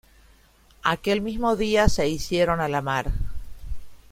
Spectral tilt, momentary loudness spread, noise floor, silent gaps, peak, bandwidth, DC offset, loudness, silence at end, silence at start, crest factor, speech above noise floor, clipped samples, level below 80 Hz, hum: -5 dB/octave; 20 LU; -56 dBFS; none; -4 dBFS; 16 kHz; under 0.1%; -24 LUFS; 0.15 s; 0.85 s; 22 dB; 33 dB; under 0.1%; -34 dBFS; none